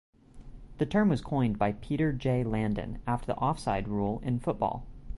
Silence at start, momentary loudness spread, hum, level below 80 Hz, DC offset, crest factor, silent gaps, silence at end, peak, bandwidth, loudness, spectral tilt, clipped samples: 0.35 s; 7 LU; none; -46 dBFS; under 0.1%; 16 dB; none; 0 s; -14 dBFS; 11.5 kHz; -30 LUFS; -8 dB/octave; under 0.1%